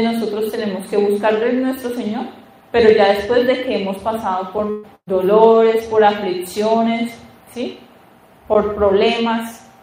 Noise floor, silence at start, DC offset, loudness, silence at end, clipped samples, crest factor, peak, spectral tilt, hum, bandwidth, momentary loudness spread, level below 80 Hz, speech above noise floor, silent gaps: -47 dBFS; 0 s; under 0.1%; -17 LUFS; 0.25 s; under 0.1%; 16 dB; 0 dBFS; -5.5 dB/octave; none; 16 kHz; 15 LU; -48 dBFS; 31 dB; none